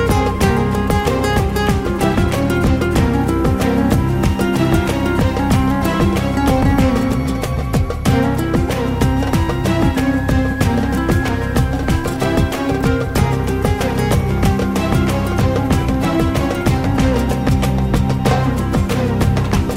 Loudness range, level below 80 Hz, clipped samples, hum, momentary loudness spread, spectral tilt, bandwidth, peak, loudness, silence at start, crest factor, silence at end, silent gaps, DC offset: 1 LU; -24 dBFS; under 0.1%; none; 2 LU; -6.5 dB/octave; 16 kHz; -2 dBFS; -16 LUFS; 0 s; 14 dB; 0 s; none; under 0.1%